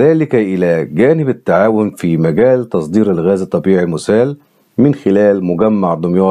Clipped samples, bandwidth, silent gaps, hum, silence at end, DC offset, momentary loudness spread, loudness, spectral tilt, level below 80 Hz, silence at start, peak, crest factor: under 0.1%; 12.5 kHz; none; none; 0 s; under 0.1%; 4 LU; -13 LUFS; -8.5 dB/octave; -52 dBFS; 0 s; 0 dBFS; 12 dB